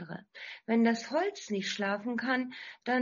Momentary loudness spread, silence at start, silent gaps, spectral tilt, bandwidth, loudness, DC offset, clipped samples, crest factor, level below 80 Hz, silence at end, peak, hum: 16 LU; 0 s; none; -3 dB/octave; 7.2 kHz; -32 LUFS; under 0.1%; under 0.1%; 18 dB; -80 dBFS; 0 s; -14 dBFS; none